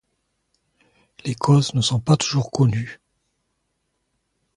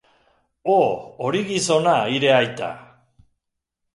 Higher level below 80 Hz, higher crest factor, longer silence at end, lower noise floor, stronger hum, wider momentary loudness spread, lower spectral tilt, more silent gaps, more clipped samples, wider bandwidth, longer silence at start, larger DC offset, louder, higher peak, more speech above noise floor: first, -54 dBFS vs -64 dBFS; about the same, 20 dB vs 18 dB; first, 1.6 s vs 1.15 s; second, -73 dBFS vs -80 dBFS; neither; about the same, 13 LU vs 13 LU; first, -5.5 dB/octave vs -4 dB/octave; neither; neither; about the same, 11 kHz vs 11.5 kHz; first, 1.25 s vs 0.65 s; neither; about the same, -20 LUFS vs -20 LUFS; about the same, -4 dBFS vs -4 dBFS; second, 54 dB vs 60 dB